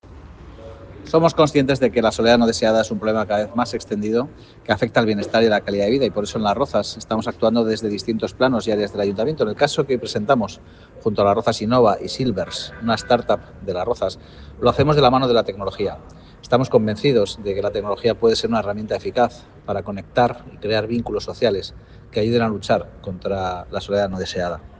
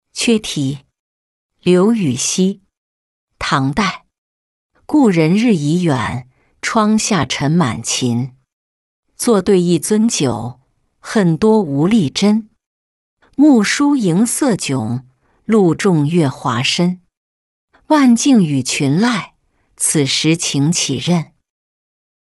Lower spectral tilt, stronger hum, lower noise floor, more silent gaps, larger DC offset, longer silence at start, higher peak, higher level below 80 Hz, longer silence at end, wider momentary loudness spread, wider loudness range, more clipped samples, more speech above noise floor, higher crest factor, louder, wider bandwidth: about the same, -5.5 dB/octave vs -5 dB/octave; neither; second, -40 dBFS vs -53 dBFS; second, none vs 0.99-1.50 s, 2.78-3.27 s, 4.18-4.70 s, 8.53-9.03 s, 12.66-13.17 s, 17.17-17.68 s; neither; about the same, 0.05 s vs 0.15 s; about the same, -2 dBFS vs -2 dBFS; about the same, -46 dBFS vs -50 dBFS; second, 0.05 s vs 1.15 s; about the same, 10 LU vs 11 LU; about the same, 4 LU vs 3 LU; neither; second, 20 dB vs 39 dB; about the same, 18 dB vs 14 dB; second, -20 LUFS vs -15 LUFS; second, 9.6 kHz vs 12 kHz